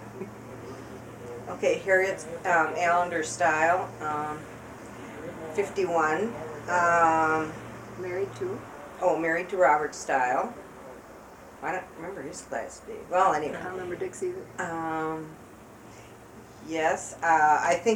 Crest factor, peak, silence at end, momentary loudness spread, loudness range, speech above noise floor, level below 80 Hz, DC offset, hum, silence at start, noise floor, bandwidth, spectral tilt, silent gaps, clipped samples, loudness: 20 dB; -10 dBFS; 0 s; 21 LU; 6 LU; 21 dB; -60 dBFS; under 0.1%; none; 0 s; -48 dBFS; 17 kHz; -4.5 dB/octave; none; under 0.1%; -27 LUFS